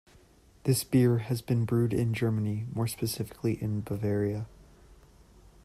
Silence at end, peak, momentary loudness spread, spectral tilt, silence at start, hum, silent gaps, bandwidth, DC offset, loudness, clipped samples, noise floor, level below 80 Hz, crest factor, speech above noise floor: 0.7 s; -14 dBFS; 8 LU; -6.5 dB/octave; 0.65 s; none; none; 15 kHz; under 0.1%; -29 LUFS; under 0.1%; -59 dBFS; -56 dBFS; 16 dB; 30 dB